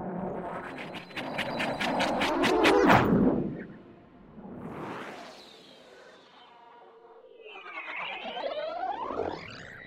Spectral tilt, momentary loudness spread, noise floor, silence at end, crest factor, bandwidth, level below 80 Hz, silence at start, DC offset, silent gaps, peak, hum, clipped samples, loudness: -5.5 dB/octave; 24 LU; -54 dBFS; 0 s; 24 dB; 16 kHz; -54 dBFS; 0 s; under 0.1%; none; -6 dBFS; none; under 0.1%; -28 LUFS